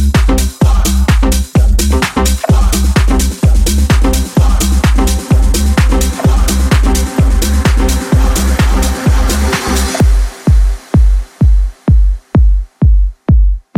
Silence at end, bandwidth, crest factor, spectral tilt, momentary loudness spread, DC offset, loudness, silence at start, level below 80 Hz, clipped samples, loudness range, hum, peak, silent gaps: 0.2 s; 16.5 kHz; 8 dB; -5.5 dB/octave; 2 LU; under 0.1%; -12 LUFS; 0 s; -10 dBFS; under 0.1%; 1 LU; none; 0 dBFS; none